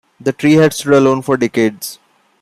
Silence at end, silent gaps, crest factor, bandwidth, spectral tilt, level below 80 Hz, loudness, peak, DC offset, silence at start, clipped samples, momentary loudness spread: 0.5 s; none; 12 dB; 15.5 kHz; -5.5 dB/octave; -56 dBFS; -13 LUFS; -2 dBFS; under 0.1%; 0.25 s; under 0.1%; 12 LU